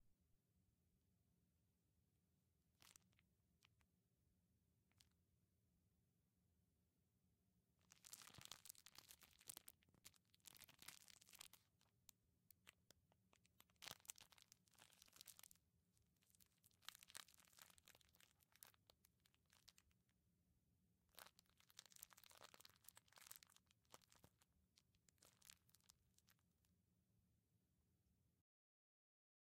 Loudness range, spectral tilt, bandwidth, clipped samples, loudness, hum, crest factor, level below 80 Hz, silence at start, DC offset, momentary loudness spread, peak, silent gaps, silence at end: 5 LU; -0.5 dB/octave; 16 kHz; under 0.1%; -64 LUFS; none; 42 dB; under -90 dBFS; 0 s; under 0.1%; 9 LU; -30 dBFS; none; 1 s